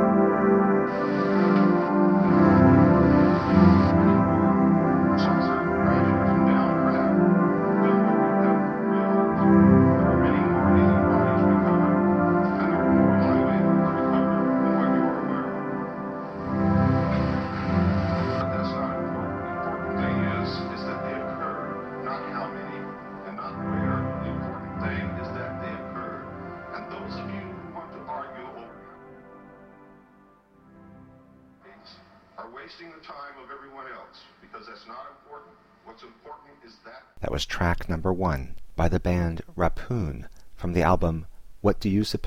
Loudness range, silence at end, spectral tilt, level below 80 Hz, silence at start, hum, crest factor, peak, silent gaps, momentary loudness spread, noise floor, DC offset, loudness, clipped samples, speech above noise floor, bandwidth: 21 LU; 0 s; -8.5 dB/octave; -42 dBFS; 0 s; none; 20 dB; -4 dBFS; none; 19 LU; -56 dBFS; under 0.1%; -23 LUFS; under 0.1%; 32 dB; 7.4 kHz